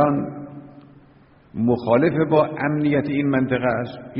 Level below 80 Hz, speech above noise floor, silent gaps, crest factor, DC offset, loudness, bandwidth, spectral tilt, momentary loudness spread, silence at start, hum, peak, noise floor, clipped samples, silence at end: -54 dBFS; 32 dB; none; 18 dB; under 0.1%; -20 LUFS; 5.6 kHz; -7 dB/octave; 18 LU; 0 s; none; -4 dBFS; -51 dBFS; under 0.1%; 0 s